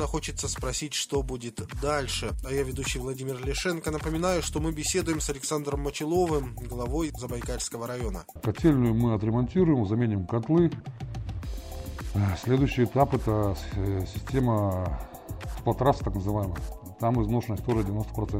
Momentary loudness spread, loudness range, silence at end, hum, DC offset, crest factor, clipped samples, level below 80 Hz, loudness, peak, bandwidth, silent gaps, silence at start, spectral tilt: 12 LU; 4 LU; 0 s; none; under 0.1%; 20 dB; under 0.1%; -38 dBFS; -28 LUFS; -8 dBFS; 16 kHz; none; 0 s; -5.5 dB/octave